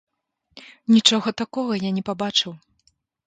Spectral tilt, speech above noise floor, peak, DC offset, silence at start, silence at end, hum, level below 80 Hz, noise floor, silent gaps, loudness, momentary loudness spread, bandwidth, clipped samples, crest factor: -3.5 dB/octave; 51 dB; 0 dBFS; under 0.1%; 0.55 s; 0.7 s; none; -66 dBFS; -72 dBFS; none; -21 LUFS; 12 LU; 9.4 kHz; under 0.1%; 24 dB